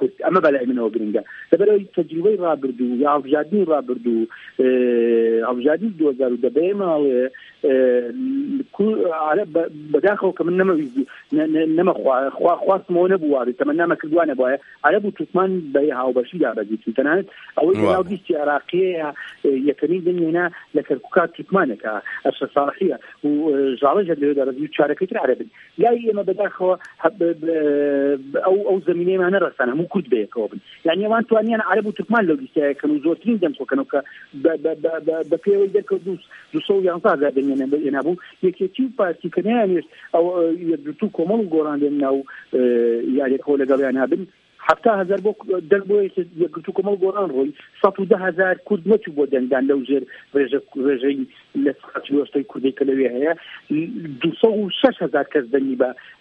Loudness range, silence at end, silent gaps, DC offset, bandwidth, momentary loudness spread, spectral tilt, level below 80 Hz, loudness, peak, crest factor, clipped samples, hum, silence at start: 2 LU; 0.1 s; none; under 0.1%; 5 kHz; 7 LU; -8 dB/octave; -68 dBFS; -20 LUFS; 0 dBFS; 20 dB; under 0.1%; none; 0 s